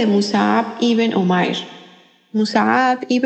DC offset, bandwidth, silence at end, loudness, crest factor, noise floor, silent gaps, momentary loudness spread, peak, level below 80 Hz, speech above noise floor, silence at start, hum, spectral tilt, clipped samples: under 0.1%; 8.6 kHz; 0 s; -17 LUFS; 16 dB; -48 dBFS; none; 8 LU; -2 dBFS; -74 dBFS; 31 dB; 0 s; none; -5.5 dB/octave; under 0.1%